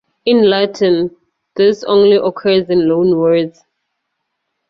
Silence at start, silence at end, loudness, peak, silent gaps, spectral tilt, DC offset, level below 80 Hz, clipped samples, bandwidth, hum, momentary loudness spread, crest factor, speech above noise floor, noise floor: 0.25 s; 1.2 s; -13 LUFS; -2 dBFS; none; -6.5 dB/octave; under 0.1%; -54 dBFS; under 0.1%; 6.8 kHz; none; 6 LU; 12 dB; 60 dB; -72 dBFS